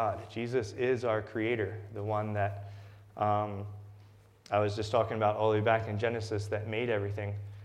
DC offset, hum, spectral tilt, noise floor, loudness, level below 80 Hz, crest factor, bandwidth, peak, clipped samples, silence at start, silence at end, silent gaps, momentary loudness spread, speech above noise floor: under 0.1%; none; -7 dB/octave; -57 dBFS; -32 LUFS; -66 dBFS; 20 dB; 10.5 kHz; -12 dBFS; under 0.1%; 0 s; 0 s; none; 12 LU; 25 dB